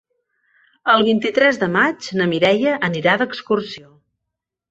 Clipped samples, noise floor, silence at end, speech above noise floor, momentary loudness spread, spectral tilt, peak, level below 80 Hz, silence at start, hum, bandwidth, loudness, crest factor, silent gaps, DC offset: under 0.1%; -81 dBFS; 0.9 s; 64 dB; 7 LU; -5.5 dB/octave; -2 dBFS; -62 dBFS; 0.85 s; none; 8 kHz; -17 LUFS; 18 dB; none; under 0.1%